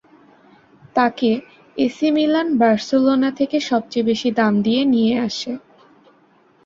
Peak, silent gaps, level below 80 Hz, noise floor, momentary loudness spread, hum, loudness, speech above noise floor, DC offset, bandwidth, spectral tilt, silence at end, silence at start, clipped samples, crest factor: -2 dBFS; none; -62 dBFS; -55 dBFS; 8 LU; none; -18 LUFS; 37 dB; under 0.1%; 7.6 kHz; -5.5 dB/octave; 1.1 s; 0.95 s; under 0.1%; 16 dB